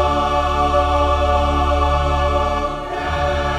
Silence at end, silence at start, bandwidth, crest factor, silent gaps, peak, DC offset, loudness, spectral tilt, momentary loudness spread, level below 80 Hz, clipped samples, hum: 0 s; 0 s; 9.8 kHz; 12 dB; none; -4 dBFS; under 0.1%; -18 LUFS; -6 dB/octave; 6 LU; -22 dBFS; under 0.1%; none